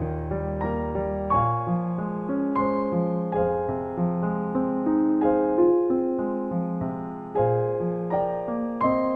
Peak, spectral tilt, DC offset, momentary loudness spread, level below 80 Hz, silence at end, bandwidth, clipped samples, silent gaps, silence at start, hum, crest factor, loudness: -10 dBFS; -11.5 dB/octave; under 0.1%; 7 LU; -44 dBFS; 0 s; 4.5 kHz; under 0.1%; none; 0 s; none; 14 dB; -25 LUFS